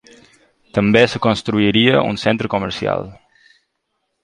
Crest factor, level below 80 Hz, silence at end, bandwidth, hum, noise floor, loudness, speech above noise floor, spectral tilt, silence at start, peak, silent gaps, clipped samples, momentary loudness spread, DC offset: 18 dB; -48 dBFS; 1.1 s; 10.5 kHz; none; -72 dBFS; -16 LUFS; 56 dB; -6 dB/octave; 0.75 s; 0 dBFS; none; under 0.1%; 9 LU; under 0.1%